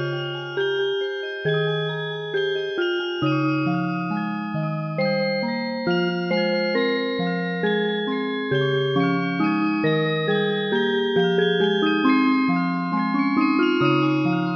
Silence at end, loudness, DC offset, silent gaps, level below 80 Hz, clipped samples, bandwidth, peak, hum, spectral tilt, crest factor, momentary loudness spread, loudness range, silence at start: 0 s; -22 LUFS; under 0.1%; none; -66 dBFS; under 0.1%; 6.6 kHz; -6 dBFS; none; -8 dB/octave; 16 dB; 7 LU; 4 LU; 0 s